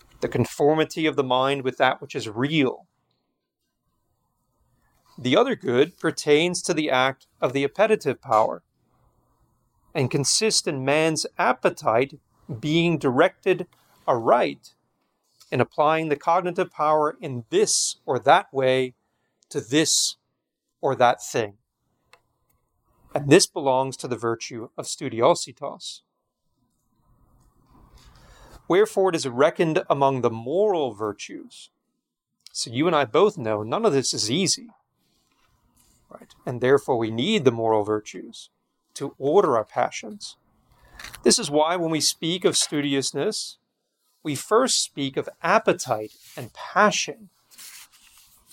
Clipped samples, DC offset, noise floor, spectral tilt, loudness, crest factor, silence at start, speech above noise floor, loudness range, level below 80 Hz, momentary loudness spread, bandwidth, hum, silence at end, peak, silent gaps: under 0.1%; under 0.1%; -80 dBFS; -3.5 dB/octave; -22 LUFS; 22 dB; 0.2 s; 57 dB; 5 LU; -64 dBFS; 15 LU; 17 kHz; none; 0.7 s; -2 dBFS; none